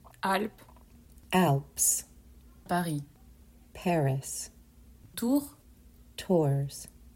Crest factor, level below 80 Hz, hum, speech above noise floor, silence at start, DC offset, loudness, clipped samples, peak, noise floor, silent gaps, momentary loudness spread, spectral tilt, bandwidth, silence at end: 20 dB; -58 dBFS; none; 27 dB; 0.25 s; under 0.1%; -29 LUFS; under 0.1%; -12 dBFS; -56 dBFS; none; 18 LU; -4.5 dB/octave; 16.5 kHz; 0.05 s